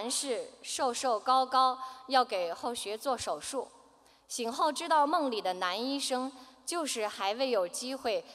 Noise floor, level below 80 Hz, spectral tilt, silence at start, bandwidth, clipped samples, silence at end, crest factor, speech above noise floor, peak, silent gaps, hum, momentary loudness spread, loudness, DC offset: -62 dBFS; -74 dBFS; -1 dB/octave; 0 s; 16 kHz; under 0.1%; 0 s; 20 dB; 30 dB; -12 dBFS; none; none; 10 LU; -31 LUFS; under 0.1%